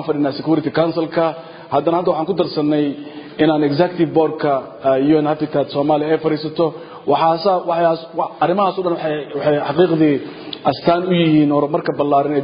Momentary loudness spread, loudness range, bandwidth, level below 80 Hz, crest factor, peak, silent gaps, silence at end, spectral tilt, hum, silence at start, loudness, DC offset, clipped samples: 7 LU; 2 LU; 5.2 kHz; -58 dBFS; 16 dB; 0 dBFS; none; 0 s; -12 dB/octave; none; 0 s; -17 LUFS; under 0.1%; under 0.1%